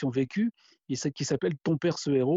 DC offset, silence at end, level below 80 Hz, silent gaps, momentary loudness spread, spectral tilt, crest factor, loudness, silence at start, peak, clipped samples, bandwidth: under 0.1%; 0 s; -66 dBFS; none; 6 LU; -6 dB/octave; 14 dB; -29 LUFS; 0 s; -14 dBFS; under 0.1%; 8 kHz